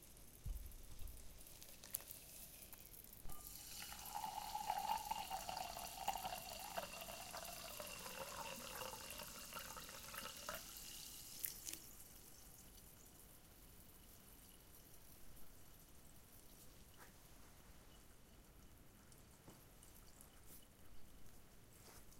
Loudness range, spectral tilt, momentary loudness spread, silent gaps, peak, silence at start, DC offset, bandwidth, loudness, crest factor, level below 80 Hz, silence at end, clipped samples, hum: 17 LU; -2 dB/octave; 18 LU; none; -16 dBFS; 0 s; under 0.1%; 17 kHz; -51 LUFS; 36 dB; -64 dBFS; 0 s; under 0.1%; none